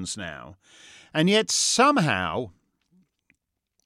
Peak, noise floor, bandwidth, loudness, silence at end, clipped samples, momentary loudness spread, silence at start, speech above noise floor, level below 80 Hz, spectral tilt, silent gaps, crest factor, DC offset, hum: -6 dBFS; -76 dBFS; 15.5 kHz; -22 LUFS; 1.35 s; under 0.1%; 18 LU; 0 s; 52 dB; -64 dBFS; -3 dB/octave; none; 20 dB; under 0.1%; none